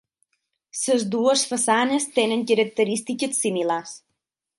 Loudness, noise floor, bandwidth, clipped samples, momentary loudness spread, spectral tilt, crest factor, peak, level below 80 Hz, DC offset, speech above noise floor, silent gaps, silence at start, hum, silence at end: -22 LUFS; -79 dBFS; 11.5 kHz; under 0.1%; 8 LU; -3 dB/octave; 18 dB; -6 dBFS; -74 dBFS; under 0.1%; 57 dB; none; 0.75 s; none; 0.6 s